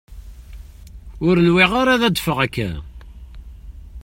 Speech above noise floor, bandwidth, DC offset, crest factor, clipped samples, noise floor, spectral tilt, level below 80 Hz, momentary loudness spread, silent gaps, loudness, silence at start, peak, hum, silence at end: 22 dB; 16.5 kHz; under 0.1%; 20 dB; under 0.1%; -38 dBFS; -5.5 dB/octave; -38 dBFS; 13 LU; none; -17 LUFS; 0.1 s; 0 dBFS; none; 0 s